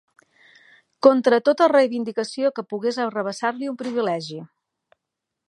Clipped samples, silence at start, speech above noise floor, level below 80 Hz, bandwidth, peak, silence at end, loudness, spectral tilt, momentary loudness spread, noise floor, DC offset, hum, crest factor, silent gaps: under 0.1%; 1.05 s; 62 dB; -78 dBFS; 11 kHz; -2 dBFS; 1.05 s; -21 LUFS; -5 dB/octave; 11 LU; -83 dBFS; under 0.1%; none; 22 dB; none